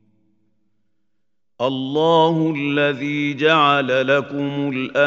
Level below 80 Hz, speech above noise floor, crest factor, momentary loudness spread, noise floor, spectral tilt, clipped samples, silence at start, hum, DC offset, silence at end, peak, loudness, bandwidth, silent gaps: -70 dBFS; 61 dB; 18 dB; 8 LU; -79 dBFS; -6.5 dB/octave; under 0.1%; 1.6 s; none; under 0.1%; 0 s; -2 dBFS; -18 LUFS; 7.6 kHz; none